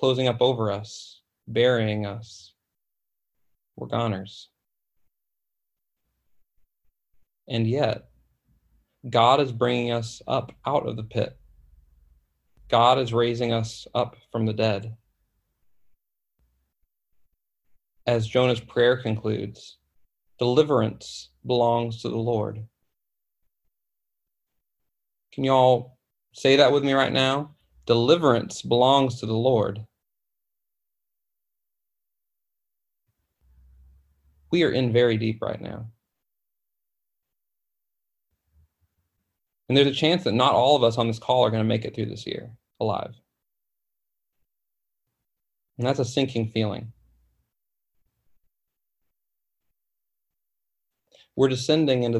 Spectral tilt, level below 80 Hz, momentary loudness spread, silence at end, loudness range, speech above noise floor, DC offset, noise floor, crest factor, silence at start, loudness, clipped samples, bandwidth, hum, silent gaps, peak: -6 dB/octave; -60 dBFS; 16 LU; 0 s; 14 LU; 64 dB; under 0.1%; -86 dBFS; 22 dB; 0 s; -23 LUFS; under 0.1%; 11.5 kHz; none; none; -4 dBFS